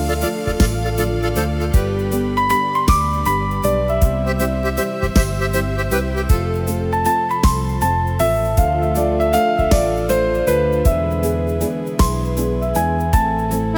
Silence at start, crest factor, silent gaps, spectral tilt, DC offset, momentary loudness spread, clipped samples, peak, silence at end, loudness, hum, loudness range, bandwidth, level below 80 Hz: 0 s; 14 dB; none; -6 dB/octave; under 0.1%; 4 LU; under 0.1%; -4 dBFS; 0 s; -18 LUFS; none; 2 LU; over 20 kHz; -22 dBFS